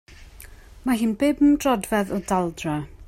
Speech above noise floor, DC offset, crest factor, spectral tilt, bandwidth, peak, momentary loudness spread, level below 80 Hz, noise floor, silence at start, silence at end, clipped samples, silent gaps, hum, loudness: 23 dB; under 0.1%; 14 dB; -5.5 dB/octave; 16.5 kHz; -8 dBFS; 10 LU; -46 dBFS; -44 dBFS; 0.1 s; 0 s; under 0.1%; none; none; -22 LUFS